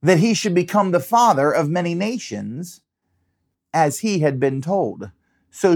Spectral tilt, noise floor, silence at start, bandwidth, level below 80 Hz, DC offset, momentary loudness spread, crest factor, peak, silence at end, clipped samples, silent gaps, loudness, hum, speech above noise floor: -5.5 dB/octave; -72 dBFS; 0.05 s; 19 kHz; -68 dBFS; under 0.1%; 14 LU; 18 dB; -2 dBFS; 0 s; under 0.1%; none; -19 LUFS; none; 53 dB